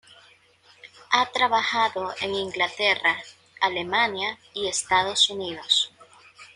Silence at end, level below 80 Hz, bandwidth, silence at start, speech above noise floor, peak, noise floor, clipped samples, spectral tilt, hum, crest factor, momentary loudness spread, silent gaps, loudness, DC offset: 0.1 s; -66 dBFS; 11.5 kHz; 0.85 s; 33 dB; -4 dBFS; -57 dBFS; under 0.1%; -1 dB/octave; none; 22 dB; 9 LU; none; -23 LUFS; under 0.1%